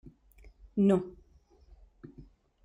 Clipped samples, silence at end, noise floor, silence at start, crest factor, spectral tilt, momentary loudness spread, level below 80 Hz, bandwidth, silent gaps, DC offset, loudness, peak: under 0.1%; 0.45 s; -61 dBFS; 0.75 s; 20 dB; -9.5 dB/octave; 26 LU; -58 dBFS; 11 kHz; none; under 0.1%; -29 LUFS; -14 dBFS